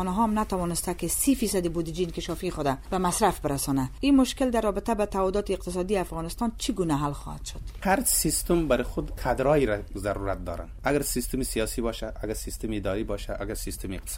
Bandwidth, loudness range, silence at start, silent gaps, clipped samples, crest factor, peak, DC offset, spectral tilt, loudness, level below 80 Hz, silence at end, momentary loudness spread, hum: 17 kHz; 4 LU; 0 s; none; under 0.1%; 18 dB; -10 dBFS; under 0.1%; -4.5 dB/octave; -27 LUFS; -38 dBFS; 0 s; 10 LU; none